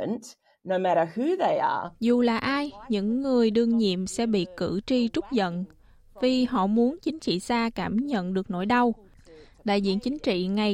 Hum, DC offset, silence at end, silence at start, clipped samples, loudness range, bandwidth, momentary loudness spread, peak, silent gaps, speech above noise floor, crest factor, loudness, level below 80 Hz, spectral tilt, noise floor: none; under 0.1%; 0 s; 0 s; under 0.1%; 2 LU; 11 kHz; 7 LU; -12 dBFS; none; 26 dB; 14 dB; -26 LUFS; -56 dBFS; -6 dB/octave; -51 dBFS